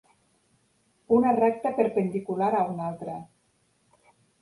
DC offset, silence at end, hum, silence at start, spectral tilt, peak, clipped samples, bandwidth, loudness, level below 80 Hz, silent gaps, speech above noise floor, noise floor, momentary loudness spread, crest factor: under 0.1%; 1.15 s; none; 1.1 s; -9 dB/octave; -8 dBFS; under 0.1%; 11.5 kHz; -26 LUFS; -68 dBFS; none; 44 dB; -69 dBFS; 14 LU; 20 dB